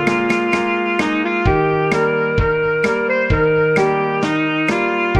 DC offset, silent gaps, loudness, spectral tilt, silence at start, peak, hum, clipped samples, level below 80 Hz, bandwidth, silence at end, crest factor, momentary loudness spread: under 0.1%; none; -17 LUFS; -6.5 dB/octave; 0 s; -2 dBFS; none; under 0.1%; -32 dBFS; 11 kHz; 0 s; 14 dB; 3 LU